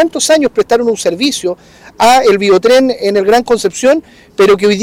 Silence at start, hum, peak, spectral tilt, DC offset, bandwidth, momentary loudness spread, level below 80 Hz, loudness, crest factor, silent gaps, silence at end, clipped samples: 0 s; none; -2 dBFS; -3.5 dB/octave; under 0.1%; 16.5 kHz; 7 LU; -46 dBFS; -10 LUFS; 8 dB; none; 0 s; under 0.1%